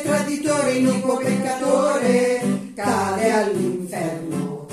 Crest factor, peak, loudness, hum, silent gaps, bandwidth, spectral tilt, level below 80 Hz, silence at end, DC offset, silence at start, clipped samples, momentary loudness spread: 16 dB; -6 dBFS; -21 LUFS; none; none; 14.5 kHz; -5 dB/octave; -64 dBFS; 0 s; under 0.1%; 0 s; under 0.1%; 8 LU